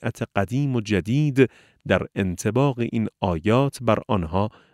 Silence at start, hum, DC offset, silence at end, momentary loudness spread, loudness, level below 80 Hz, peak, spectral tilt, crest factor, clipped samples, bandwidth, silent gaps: 0 s; none; under 0.1%; 0.25 s; 6 LU; -23 LUFS; -48 dBFS; -2 dBFS; -7 dB/octave; 20 dB; under 0.1%; 14 kHz; none